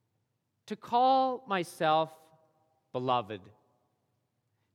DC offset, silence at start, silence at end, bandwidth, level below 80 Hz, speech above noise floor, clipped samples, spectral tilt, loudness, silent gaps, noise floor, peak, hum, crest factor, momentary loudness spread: under 0.1%; 0.7 s; 1.35 s; 14 kHz; -86 dBFS; 50 dB; under 0.1%; -5.5 dB/octave; -30 LUFS; none; -80 dBFS; -14 dBFS; none; 18 dB; 18 LU